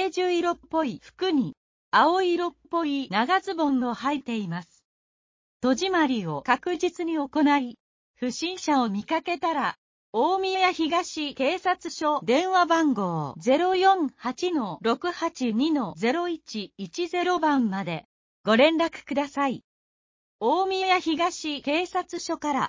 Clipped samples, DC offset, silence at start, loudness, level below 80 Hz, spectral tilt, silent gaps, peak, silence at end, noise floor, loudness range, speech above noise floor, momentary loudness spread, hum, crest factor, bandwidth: under 0.1%; under 0.1%; 0 s; -25 LUFS; -66 dBFS; -4.5 dB/octave; 1.57-1.92 s, 4.85-5.60 s, 7.80-8.14 s, 9.78-10.13 s, 18.05-18.44 s, 19.64-20.39 s; -6 dBFS; 0 s; under -90 dBFS; 4 LU; over 65 dB; 9 LU; none; 18 dB; 7.6 kHz